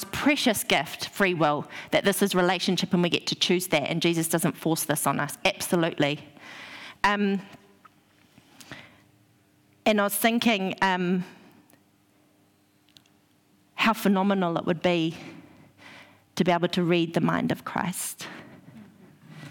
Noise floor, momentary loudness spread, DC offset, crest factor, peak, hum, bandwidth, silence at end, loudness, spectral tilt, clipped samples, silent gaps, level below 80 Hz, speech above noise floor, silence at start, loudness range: -63 dBFS; 18 LU; under 0.1%; 16 dB; -10 dBFS; none; 18 kHz; 0 s; -25 LUFS; -4.5 dB/octave; under 0.1%; none; -64 dBFS; 38 dB; 0 s; 6 LU